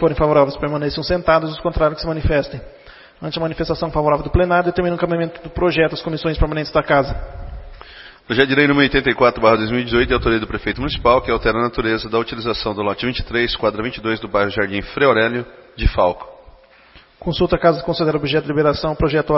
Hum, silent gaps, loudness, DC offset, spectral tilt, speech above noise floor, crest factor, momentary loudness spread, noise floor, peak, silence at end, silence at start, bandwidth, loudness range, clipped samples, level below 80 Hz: none; none; -18 LUFS; under 0.1%; -9 dB/octave; 30 dB; 18 dB; 10 LU; -47 dBFS; 0 dBFS; 0 s; 0 s; 6 kHz; 4 LU; under 0.1%; -32 dBFS